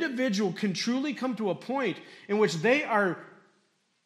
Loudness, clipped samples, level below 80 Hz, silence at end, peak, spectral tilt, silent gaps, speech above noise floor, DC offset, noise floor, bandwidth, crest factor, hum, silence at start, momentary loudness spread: -28 LUFS; under 0.1%; -82 dBFS; 0.75 s; -10 dBFS; -5 dB/octave; none; 43 dB; under 0.1%; -71 dBFS; 13.5 kHz; 18 dB; none; 0 s; 8 LU